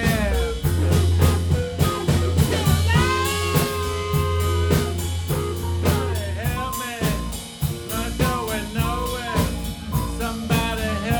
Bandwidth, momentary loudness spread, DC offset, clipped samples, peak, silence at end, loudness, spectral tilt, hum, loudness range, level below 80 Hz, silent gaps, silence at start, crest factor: over 20 kHz; 8 LU; under 0.1%; under 0.1%; -4 dBFS; 0 s; -22 LUFS; -5.5 dB/octave; none; 5 LU; -30 dBFS; none; 0 s; 18 dB